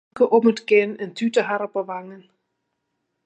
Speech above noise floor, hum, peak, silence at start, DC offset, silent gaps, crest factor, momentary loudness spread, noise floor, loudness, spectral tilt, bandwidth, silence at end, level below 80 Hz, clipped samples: 56 dB; none; -4 dBFS; 0.15 s; under 0.1%; none; 18 dB; 12 LU; -76 dBFS; -20 LUFS; -5.5 dB/octave; 8.8 kHz; 1.05 s; -74 dBFS; under 0.1%